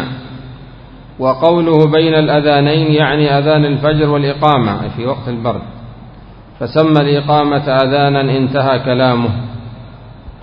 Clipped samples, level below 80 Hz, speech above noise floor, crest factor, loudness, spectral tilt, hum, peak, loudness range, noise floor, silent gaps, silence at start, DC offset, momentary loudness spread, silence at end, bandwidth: under 0.1%; -38 dBFS; 24 dB; 14 dB; -12 LUFS; -9.5 dB/octave; none; 0 dBFS; 4 LU; -36 dBFS; none; 0 s; under 0.1%; 17 LU; 0 s; 5.4 kHz